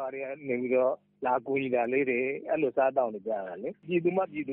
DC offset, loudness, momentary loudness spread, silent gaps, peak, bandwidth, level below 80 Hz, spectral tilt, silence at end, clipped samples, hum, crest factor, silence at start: under 0.1%; -29 LUFS; 8 LU; none; -14 dBFS; 3.8 kHz; -74 dBFS; -5.5 dB/octave; 0 s; under 0.1%; none; 14 dB; 0 s